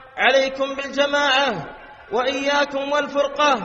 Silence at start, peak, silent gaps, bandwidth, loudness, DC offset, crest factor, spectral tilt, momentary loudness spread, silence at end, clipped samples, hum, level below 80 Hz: 0 s; -2 dBFS; none; 8 kHz; -20 LUFS; under 0.1%; 18 dB; -2.5 dB/octave; 8 LU; 0 s; under 0.1%; none; -54 dBFS